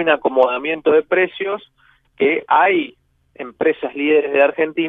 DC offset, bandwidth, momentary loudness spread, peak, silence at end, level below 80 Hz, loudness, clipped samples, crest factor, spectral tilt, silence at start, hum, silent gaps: under 0.1%; 3.9 kHz; 11 LU; -2 dBFS; 0 s; -64 dBFS; -17 LUFS; under 0.1%; 16 dB; -7.5 dB/octave; 0 s; none; none